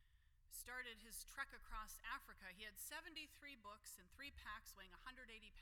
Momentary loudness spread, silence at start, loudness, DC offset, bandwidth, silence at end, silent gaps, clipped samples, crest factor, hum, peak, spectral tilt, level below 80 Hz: 7 LU; 0 s; -55 LUFS; under 0.1%; 19 kHz; 0 s; none; under 0.1%; 22 dB; none; -34 dBFS; -1 dB/octave; -66 dBFS